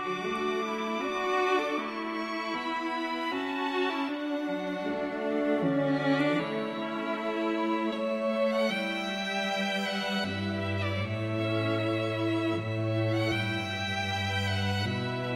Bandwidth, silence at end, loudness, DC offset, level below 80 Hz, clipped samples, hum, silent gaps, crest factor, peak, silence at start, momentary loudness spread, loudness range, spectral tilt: 15.5 kHz; 0 s; -30 LUFS; under 0.1%; -68 dBFS; under 0.1%; none; none; 14 dB; -16 dBFS; 0 s; 5 LU; 2 LU; -6 dB/octave